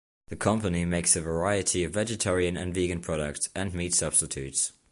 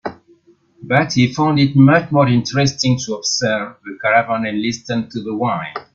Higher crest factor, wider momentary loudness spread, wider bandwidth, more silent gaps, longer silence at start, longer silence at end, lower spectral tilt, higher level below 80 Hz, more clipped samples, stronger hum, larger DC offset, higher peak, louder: about the same, 20 dB vs 16 dB; second, 7 LU vs 11 LU; first, 11.5 kHz vs 7.6 kHz; neither; first, 0.3 s vs 0.05 s; about the same, 0.2 s vs 0.15 s; second, -3.5 dB/octave vs -5.5 dB/octave; first, -44 dBFS vs -54 dBFS; neither; neither; neither; second, -8 dBFS vs 0 dBFS; second, -27 LUFS vs -16 LUFS